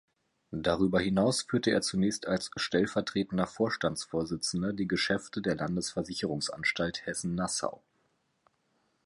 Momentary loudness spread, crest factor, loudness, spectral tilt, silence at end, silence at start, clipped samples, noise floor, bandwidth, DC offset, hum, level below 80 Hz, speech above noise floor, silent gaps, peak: 6 LU; 20 dB; -31 LUFS; -4.5 dB/octave; 1.3 s; 0.5 s; under 0.1%; -74 dBFS; 11.5 kHz; under 0.1%; none; -58 dBFS; 44 dB; none; -12 dBFS